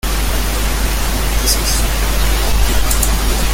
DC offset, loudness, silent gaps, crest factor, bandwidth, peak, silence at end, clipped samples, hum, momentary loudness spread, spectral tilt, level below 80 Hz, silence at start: under 0.1%; -16 LUFS; none; 14 dB; 17 kHz; 0 dBFS; 0 s; under 0.1%; none; 3 LU; -3 dB/octave; -16 dBFS; 0.05 s